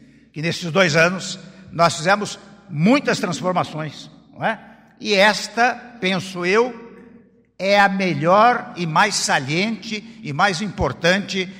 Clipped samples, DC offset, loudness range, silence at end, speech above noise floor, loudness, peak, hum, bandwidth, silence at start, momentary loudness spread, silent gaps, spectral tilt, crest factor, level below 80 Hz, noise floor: under 0.1%; under 0.1%; 3 LU; 0 s; 31 dB; -19 LUFS; -2 dBFS; none; 16 kHz; 0.35 s; 15 LU; none; -4 dB/octave; 16 dB; -48 dBFS; -50 dBFS